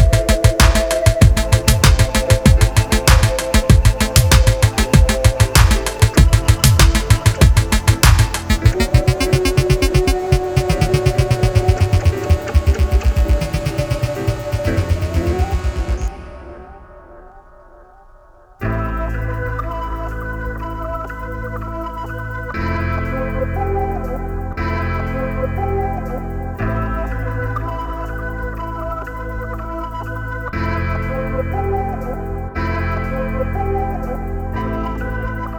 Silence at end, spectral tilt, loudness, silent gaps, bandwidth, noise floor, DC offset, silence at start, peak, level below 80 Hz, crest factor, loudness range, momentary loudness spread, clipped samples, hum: 0 s; -5 dB/octave; -17 LUFS; none; 20 kHz; -45 dBFS; under 0.1%; 0 s; 0 dBFS; -20 dBFS; 16 dB; 12 LU; 13 LU; under 0.1%; none